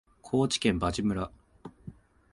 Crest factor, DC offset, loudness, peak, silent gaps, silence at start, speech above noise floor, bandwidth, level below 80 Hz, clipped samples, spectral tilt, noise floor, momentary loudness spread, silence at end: 20 dB; under 0.1%; -29 LUFS; -12 dBFS; none; 0.25 s; 22 dB; 11.5 kHz; -48 dBFS; under 0.1%; -5 dB/octave; -50 dBFS; 23 LU; 0.4 s